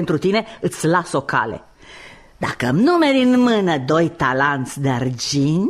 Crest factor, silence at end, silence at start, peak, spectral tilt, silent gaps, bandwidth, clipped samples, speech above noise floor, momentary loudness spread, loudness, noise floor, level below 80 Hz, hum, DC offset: 14 dB; 0 s; 0 s; -4 dBFS; -5.5 dB/octave; none; 13.5 kHz; under 0.1%; 24 dB; 9 LU; -18 LUFS; -42 dBFS; -50 dBFS; none; under 0.1%